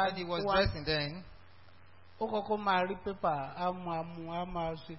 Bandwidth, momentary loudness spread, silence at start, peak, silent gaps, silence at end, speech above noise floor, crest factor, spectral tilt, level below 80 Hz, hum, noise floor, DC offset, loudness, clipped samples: 5.8 kHz; 9 LU; 0 s; -16 dBFS; none; 0 s; 26 dB; 18 dB; -3.5 dB/octave; -52 dBFS; none; -60 dBFS; 0.2%; -34 LUFS; under 0.1%